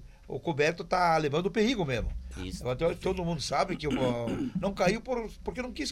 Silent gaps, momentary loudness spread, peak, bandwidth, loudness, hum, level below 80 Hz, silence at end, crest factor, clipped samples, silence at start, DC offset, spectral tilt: none; 10 LU; -12 dBFS; 15.5 kHz; -30 LUFS; none; -44 dBFS; 0 s; 18 dB; under 0.1%; 0 s; under 0.1%; -5.5 dB/octave